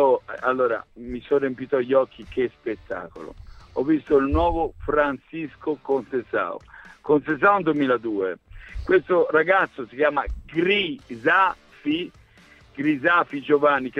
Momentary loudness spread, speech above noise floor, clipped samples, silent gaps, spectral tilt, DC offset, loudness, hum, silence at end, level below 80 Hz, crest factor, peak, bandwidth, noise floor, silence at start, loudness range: 15 LU; 30 dB; under 0.1%; none; -7.5 dB/octave; under 0.1%; -23 LUFS; none; 0 s; -42 dBFS; 18 dB; -4 dBFS; 7 kHz; -52 dBFS; 0 s; 3 LU